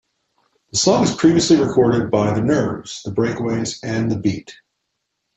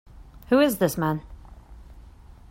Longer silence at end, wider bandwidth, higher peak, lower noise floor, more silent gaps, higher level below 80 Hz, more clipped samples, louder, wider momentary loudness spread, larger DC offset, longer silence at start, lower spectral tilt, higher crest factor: first, 0.85 s vs 0.5 s; second, 8.4 kHz vs 16.5 kHz; first, -2 dBFS vs -8 dBFS; first, -75 dBFS vs -47 dBFS; neither; about the same, -50 dBFS vs -46 dBFS; neither; first, -18 LUFS vs -23 LUFS; about the same, 9 LU vs 8 LU; neither; first, 0.75 s vs 0.15 s; about the same, -5 dB/octave vs -5.5 dB/octave; about the same, 16 dB vs 18 dB